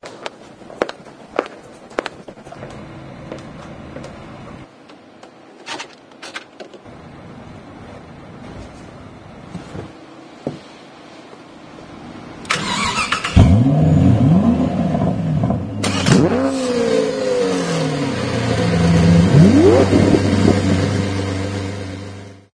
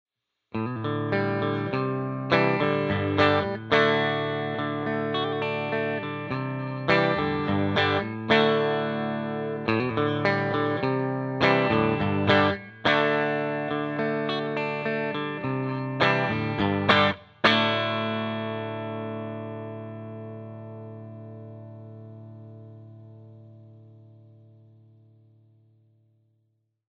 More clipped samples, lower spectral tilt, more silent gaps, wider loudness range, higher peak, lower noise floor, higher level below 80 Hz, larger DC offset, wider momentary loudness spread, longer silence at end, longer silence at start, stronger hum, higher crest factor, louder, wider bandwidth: neither; about the same, -6.5 dB/octave vs -7 dB/octave; neither; first, 22 LU vs 16 LU; first, 0 dBFS vs -4 dBFS; second, -43 dBFS vs -73 dBFS; first, -34 dBFS vs -60 dBFS; neither; first, 25 LU vs 19 LU; second, 0.2 s vs 2.9 s; second, 0 s vs 0.55 s; neither; about the same, 18 dB vs 22 dB; first, -16 LUFS vs -25 LUFS; first, 10.5 kHz vs 7.4 kHz